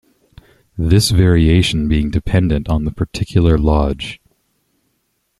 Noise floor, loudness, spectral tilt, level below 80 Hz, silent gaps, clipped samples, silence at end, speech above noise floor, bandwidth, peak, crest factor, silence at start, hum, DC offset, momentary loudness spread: -67 dBFS; -15 LUFS; -6 dB/octave; -26 dBFS; none; under 0.1%; 1.25 s; 53 dB; 13 kHz; -2 dBFS; 14 dB; 0.75 s; none; under 0.1%; 12 LU